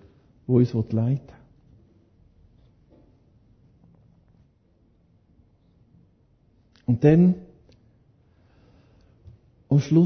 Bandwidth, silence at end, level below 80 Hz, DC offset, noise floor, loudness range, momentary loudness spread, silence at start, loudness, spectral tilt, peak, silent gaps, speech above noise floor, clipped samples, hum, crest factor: 6.4 kHz; 0 s; -56 dBFS; under 0.1%; -62 dBFS; 9 LU; 15 LU; 0.5 s; -22 LUFS; -9.5 dB/octave; -6 dBFS; none; 43 dB; under 0.1%; none; 22 dB